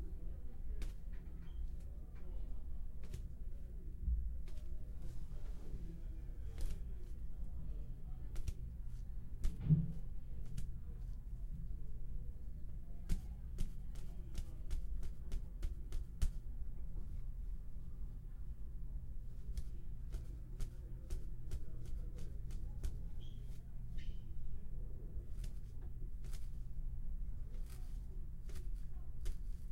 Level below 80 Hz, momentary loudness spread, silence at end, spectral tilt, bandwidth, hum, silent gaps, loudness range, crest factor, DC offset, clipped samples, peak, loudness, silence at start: -44 dBFS; 5 LU; 0 s; -7 dB/octave; 11.5 kHz; none; none; 8 LU; 20 dB; under 0.1%; under 0.1%; -20 dBFS; -49 LUFS; 0 s